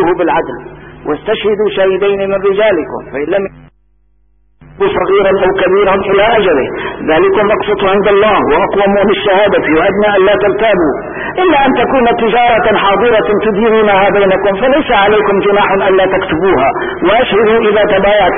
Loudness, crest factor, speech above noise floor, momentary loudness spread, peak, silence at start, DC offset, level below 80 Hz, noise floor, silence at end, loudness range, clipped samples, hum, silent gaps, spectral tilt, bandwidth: -10 LUFS; 10 dB; 44 dB; 7 LU; 0 dBFS; 0 s; under 0.1%; -36 dBFS; -53 dBFS; 0 s; 4 LU; under 0.1%; none; none; -10.5 dB/octave; 3.7 kHz